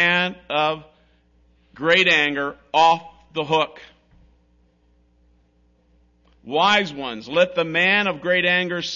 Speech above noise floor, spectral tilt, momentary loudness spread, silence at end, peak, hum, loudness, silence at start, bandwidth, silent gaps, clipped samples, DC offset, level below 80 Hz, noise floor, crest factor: 40 dB; -4 dB/octave; 11 LU; 0 s; -4 dBFS; 60 Hz at -60 dBFS; -19 LUFS; 0 s; 7.4 kHz; none; under 0.1%; under 0.1%; -60 dBFS; -60 dBFS; 18 dB